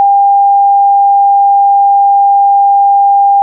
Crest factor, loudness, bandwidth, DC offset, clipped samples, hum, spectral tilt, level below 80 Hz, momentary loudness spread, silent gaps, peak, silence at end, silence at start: 4 dB; -7 LUFS; 1 kHz; under 0.1%; under 0.1%; none; 4.5 dB/octave; under -90 dBFS; 0 LU; none; -4 dBFS; 0 s; 0 s